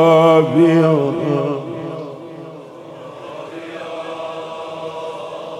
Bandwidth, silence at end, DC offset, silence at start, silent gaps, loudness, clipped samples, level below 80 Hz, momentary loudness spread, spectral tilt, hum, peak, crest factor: 11 kHz; 0 s; under 0.1%; 0 s; none; -17 LUFS; under 0.1%; -66 dBFS; 22 LU; -7.5 dB/octave; none; -2 dBFS; 16 dB